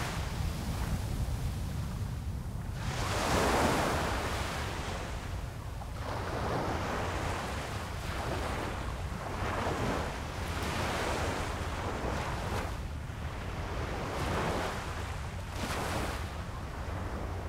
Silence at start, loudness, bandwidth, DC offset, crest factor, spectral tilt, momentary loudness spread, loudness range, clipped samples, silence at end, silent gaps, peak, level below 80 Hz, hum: 0 s; -35 LUFS; 16 kHz; under 0.1%; 20 dB; -5 dB/octave; 8 LU; 4 LU; under 0.1%; 0 s; none; -14 dBFS; -42 dBFS; none